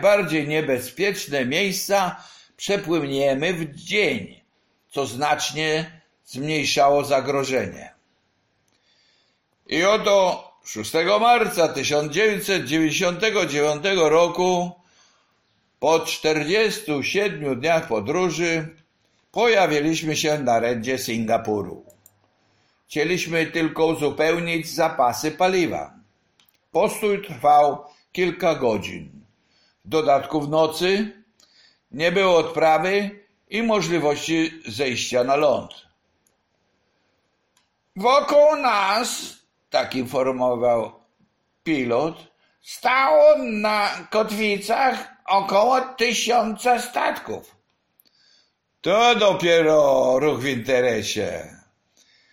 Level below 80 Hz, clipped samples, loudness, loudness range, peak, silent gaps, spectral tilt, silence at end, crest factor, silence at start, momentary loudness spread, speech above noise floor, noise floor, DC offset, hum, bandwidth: -58 dBFS; under 0.1%; -21 LUFS; 5 LU; -4 dBFS; none; -4 dB/octave; 0.75 s; 16 dB; 0 s; 12 LU; 49 dB; -69 dBFS; under 0.1%; none; 16.5 kHz